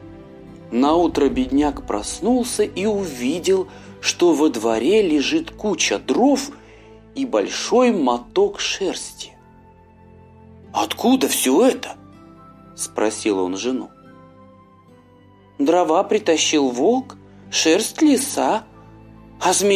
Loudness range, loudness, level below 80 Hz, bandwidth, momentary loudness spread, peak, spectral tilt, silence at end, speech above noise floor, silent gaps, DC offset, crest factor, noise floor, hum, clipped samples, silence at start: 5 LU; -19 LUFS; -48 dBFS; 16 kHz; 11 LU; -4 dBFS; -3 dB/octave; 0 s; 31 dB; none; under 0.1%; 16 dB; -49 dBFS; none; under 0.1%; 0 s